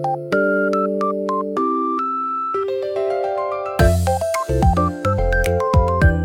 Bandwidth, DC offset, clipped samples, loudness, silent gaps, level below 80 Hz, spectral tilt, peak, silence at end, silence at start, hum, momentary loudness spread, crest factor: 17 kHz; under 0.1%; under 0.1%; -19 LUFS; none; -26 dBFS; -7 dB/octave; -2 dBFS; 0 s; 0 s; none; 5 LU; 16 dB